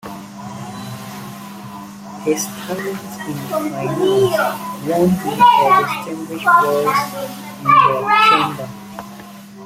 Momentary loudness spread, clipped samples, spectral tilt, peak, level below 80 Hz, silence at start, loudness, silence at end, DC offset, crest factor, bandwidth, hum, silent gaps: 21 LU; under 0.1%; -4.5 dB/octave; 0 dBFS; -56 dBFS; 0.05 s; -16 LUFS; 0 s; under 0.1%; 16 dB; 16.5 kHz; none; none